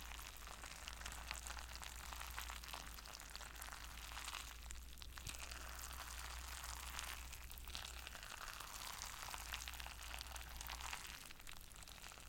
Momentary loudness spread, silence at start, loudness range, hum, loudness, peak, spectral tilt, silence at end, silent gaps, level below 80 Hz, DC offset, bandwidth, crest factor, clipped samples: 5 LU; 0 s; 2 LU; none; -51 LUFS; -22 dBFS; -1.5 dB/octave; 0 s; none; -56 dBFS; under 0.1%; 17 kHz; 30 dB; under 0.1%